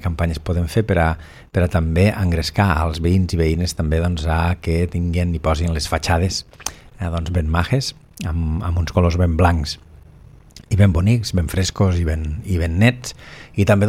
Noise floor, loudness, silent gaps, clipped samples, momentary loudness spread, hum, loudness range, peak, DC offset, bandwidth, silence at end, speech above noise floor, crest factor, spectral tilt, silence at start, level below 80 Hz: -44 dBFS; -19 LUFS; none; under 0.1%; 10 LU; none; 3 LU; 0 dBFS; under 0.1%; 15 kHz; 0 s; 26 dB; 18 dB; -6 dB/octave; 0 s; -32 dBFS